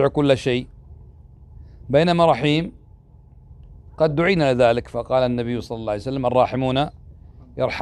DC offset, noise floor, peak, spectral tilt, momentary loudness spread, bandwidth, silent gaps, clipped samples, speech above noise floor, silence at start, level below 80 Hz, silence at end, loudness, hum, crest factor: under 0.1%; -48 dBFS; -4 dBFS; -7 dB/octave; 10 LU; 11.5 kHz; none; under 0.1%; 28 dB; 0 s; -44 dBFS; 0 s; -20 LUFS; none; 18 dB